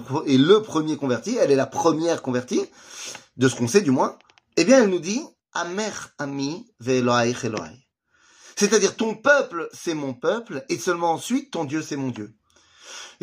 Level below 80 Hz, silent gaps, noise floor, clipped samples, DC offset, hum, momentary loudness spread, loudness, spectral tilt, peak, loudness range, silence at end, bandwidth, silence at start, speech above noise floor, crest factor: -68 dBFS; none; -61 dBFS; under 0.1%; under 0.1%; none; 16 LU; -22 LUFS; -4.5 dB/octave; -4 dBFS; 5 LU; 0.15 s; 15.5 kHz; 0 s; 38 dB; 20 dB